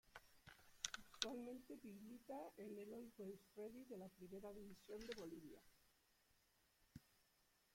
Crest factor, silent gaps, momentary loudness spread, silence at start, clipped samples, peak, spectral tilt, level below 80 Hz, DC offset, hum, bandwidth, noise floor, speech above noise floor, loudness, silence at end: 38 dB; none; 19 LU; 0.05 s; under 0.1%; -20 dBFS; -3 dB/octave; -80 dBFS; under 0.1%; none; 16.5 kHz; -81 dBFS; 25 dB; -55 LUFS; 0.3 s